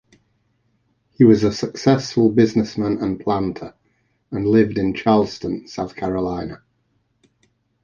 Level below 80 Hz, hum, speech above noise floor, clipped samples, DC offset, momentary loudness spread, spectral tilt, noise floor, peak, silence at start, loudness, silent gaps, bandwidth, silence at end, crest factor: -48 dBFS; none; 48 dB; under 0.1%; under 0.1%; 14 LU; -7 dB/octave; -66 dBFS; -2 dBFS; 1.2 s; -19 LUFS; none; 7.4 kHz; 1.3 s; 18 dB